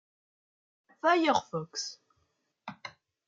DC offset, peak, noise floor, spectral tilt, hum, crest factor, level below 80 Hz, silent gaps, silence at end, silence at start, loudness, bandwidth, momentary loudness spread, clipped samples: under 0.1%; -12 dBFS; -77 dBFS; -3.5 dB/octave; none; 20 dB; -80 dBFS; none; 0.4 s; 1.05 s; -29 LUFS; 7.8 kHz; 22 LU; under 0.1%